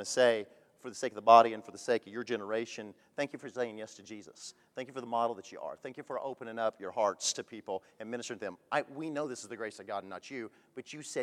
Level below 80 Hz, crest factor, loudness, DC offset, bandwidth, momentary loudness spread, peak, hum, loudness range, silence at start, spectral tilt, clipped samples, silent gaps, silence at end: -88 dBFS; 26 dB; -33 LUFS; under 0.1%; 13 kHz; 18 LU; -8 dBFS; none; 9 LU; 0 s; -3 dB/octave; under 0.1%; none; 0 s